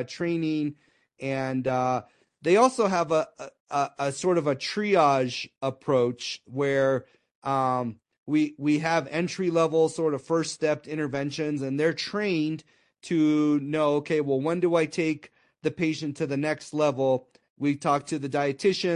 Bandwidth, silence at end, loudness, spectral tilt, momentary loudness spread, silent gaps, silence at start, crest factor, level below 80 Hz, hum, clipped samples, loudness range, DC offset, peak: 11 kHz; 0 s; -26 LUFS; -5.5 dB/octave; 9 LU; 3.60-3.66 s, 7.35-7.42 s, 8.18-8.26 s, 17.50-17.56 s; 0 s; 20 dB; -70 dBFS; none; under 0.1%; 2 LU; under 0.1%; -6 dBFS